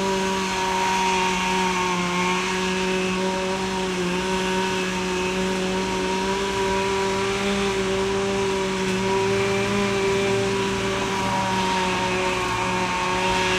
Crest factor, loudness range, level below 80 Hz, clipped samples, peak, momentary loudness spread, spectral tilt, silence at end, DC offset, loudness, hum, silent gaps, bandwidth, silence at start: 14 dB; 1 LU; -44 dBFS; under 0.1%; -10 dBFS; 3 LU; -4 dB/octave; 0 s; under 0.1%; -22 LUFS; none; none; 15.5 kHz; 0 s